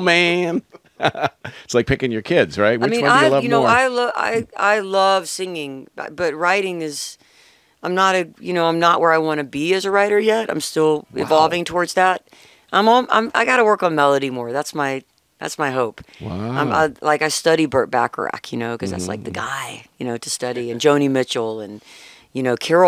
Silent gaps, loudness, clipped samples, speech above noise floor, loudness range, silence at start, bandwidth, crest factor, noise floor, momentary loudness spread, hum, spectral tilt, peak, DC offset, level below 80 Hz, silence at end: none; -18 LUFS; under 0.1%; 35 dB; 5 LU; 0 s; 16 kHz; 18 dB; -53 dBFS; 13 LU; none; -4 dB/octave; 0 dBFS; under 0.1%; -52 dBFS; 0 s